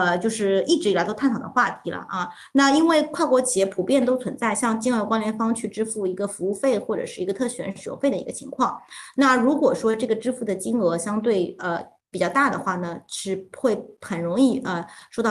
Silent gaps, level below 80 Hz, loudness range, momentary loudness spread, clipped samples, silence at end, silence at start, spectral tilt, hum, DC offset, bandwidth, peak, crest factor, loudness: none; -66 dBFS; 4 LU; 10 LU; under 0.1%; 0 s; 0 s; -4.5 dB/octave; none; under 0.1%; 12.5 kHz; -6 dBFS; 16 dB; -23 LUFS